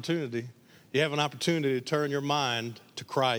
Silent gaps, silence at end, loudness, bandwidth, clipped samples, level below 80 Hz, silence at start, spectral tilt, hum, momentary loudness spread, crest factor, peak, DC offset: none; 0 s; -29 LUFS; over 20 kHz; under 0.1%; -76 dBFS; 0 s; -4.5 dB/octave; none; 10 LU; 18 dB; -12 dBFS; under 0.1%